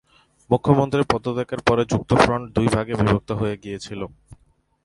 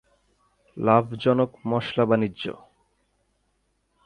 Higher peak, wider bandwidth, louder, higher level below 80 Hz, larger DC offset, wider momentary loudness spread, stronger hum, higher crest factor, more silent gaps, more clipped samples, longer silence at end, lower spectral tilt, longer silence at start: first, 0 dBFS vs -4 dBFS; first, 11.5 kHz vs 9.4 kHz; first, -21 LUFS vs -24 LUFS; first, -42 dBFS vs -62 dBFS; neither; first, 14 LU vs 9 LU; second, none vs 50 Hz at -60 dBFS; about the same, 20 dB vs 22 dB; neither; neither; second, 0.5 s vs 1.55 s; second, -6.5 dB/octave vs -8.5 dB/octave; second, 0.5 s vs 0.75 s